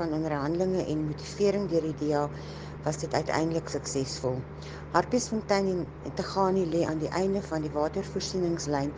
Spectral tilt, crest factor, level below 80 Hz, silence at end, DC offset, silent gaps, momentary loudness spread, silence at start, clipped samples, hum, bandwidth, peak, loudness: -5.5 dB/octave; 22 dB; -50 dBFS; 0 s; under 0.1%; none; 8 LU; 0 s; under 0.1%; none; 10 kHz; -6 dBFS; -29 LUFS